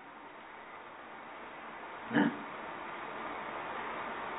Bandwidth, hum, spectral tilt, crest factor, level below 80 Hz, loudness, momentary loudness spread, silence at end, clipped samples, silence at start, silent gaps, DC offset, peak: 3.9 kHz; none; -1.5 dB/octave; 26 dB; -74 dBFS; -39 LUFS; 17 LU; 0 s; under 0.1%; 0 s; none; under 0.1%; -14 dBFS